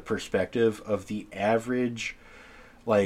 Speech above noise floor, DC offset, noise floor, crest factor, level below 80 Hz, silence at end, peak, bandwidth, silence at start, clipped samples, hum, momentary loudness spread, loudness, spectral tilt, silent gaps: 22 dB; under 0.1%; -50 dBFS; 18 dB; -56 dBFS; 0 s; -10 dBFS; 14.5 kHz; 0 s; under 0.1%; none; 18 LU; -28 LUFS; -5.5 dB/octave; none